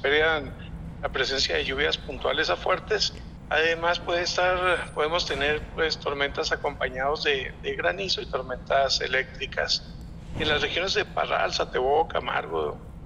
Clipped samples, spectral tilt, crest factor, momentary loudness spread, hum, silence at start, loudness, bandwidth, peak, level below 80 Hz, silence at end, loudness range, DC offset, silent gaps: under 0.1%; -3 dB/octave; 16 dB; 8 LU; none; 0 s; -26 LUFS; 10.5 kHz; -10 dBFS; -44 dBFS; 0 s; 2 LU; under 0.1%; none